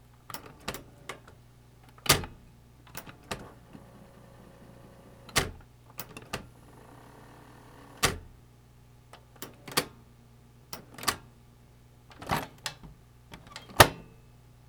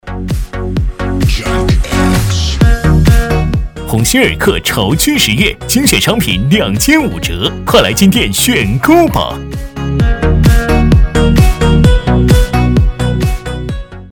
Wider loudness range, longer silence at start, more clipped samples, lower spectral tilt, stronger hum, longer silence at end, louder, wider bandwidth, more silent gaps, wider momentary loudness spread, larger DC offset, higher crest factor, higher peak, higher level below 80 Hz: first, 8 LU vs 2 LU; first, 0.3 s vs 0.05 s; second, under 0.1% vs 0.5%; second, -2.5 dB/octave vs -5 dB/octave; first, 60 Hz at -60 dBFS vs none; first, 0.65 s vs 0 s; second, -30 LUFS vs -11 LUFS; about the same, over 20 kHz vs 19.5 kHz; neither; first, 27 LU vs 9 LU; neither; first, 36 dB vs 10 dB; about the same, 0 dBFS vs 0 dBFS; second, -52 dBFS vs -16 dBFS